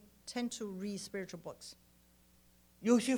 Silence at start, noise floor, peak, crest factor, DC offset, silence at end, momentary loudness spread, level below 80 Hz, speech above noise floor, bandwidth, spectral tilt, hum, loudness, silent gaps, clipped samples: 0.25 s; -67 dBFS; -18 dBFS; 20 dB; under 0.1%; 0 s; 20 LU; -72 dBFS; 31 dB; over 20 kHz; -4.5 dB/octave; 60 Hz at -65 dBFS; -39 LUFS; none; under 0.1%